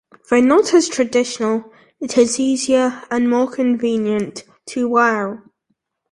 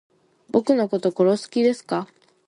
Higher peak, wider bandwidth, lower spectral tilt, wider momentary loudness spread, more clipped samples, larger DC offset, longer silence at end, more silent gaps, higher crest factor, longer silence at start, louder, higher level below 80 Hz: about the same, -2 dBFS vs -4 dBFS; about the same, 11.5 kHz vs 11 kHz; second, -4 dB/octave vs -6.5 dB/octave; first, 13 LU vs 9 LU; neither; neither; first, 0.75 s vs 0.45 s; neither; about the same, 16 dB vs 18 dB; second, 0.3 s vs 0.55 s; first, -17 LUFS vs -22 LUFS; first, -60 dBFS vs -70 dBFS